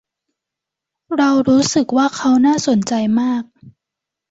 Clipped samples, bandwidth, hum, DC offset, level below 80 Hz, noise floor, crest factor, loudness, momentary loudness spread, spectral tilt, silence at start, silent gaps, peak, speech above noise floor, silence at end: under 0.1%; 8 kHz; none; under 0.1%; -56 dBFS; -84 dBFS; 14 dB; -15 LUFS; 6 LU; -4.5 dB/octave; 1.1 s; none; -4 dBFS; 69 dB; 0.6 s